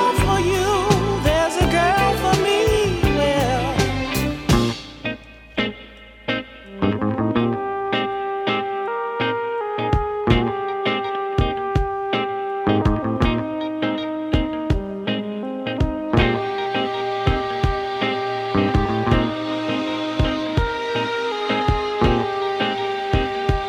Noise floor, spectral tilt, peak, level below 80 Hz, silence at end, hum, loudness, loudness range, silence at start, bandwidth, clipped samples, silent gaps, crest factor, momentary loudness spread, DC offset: -42 dBFS; -5.5 dB/octave; -2 dBFS; -30 dBFS; 0 s; none; -21 LUFS; 5 LU; 0 s; 16 kHz; under 0.1%; none; 18 dB; 7 LU; under 0.1%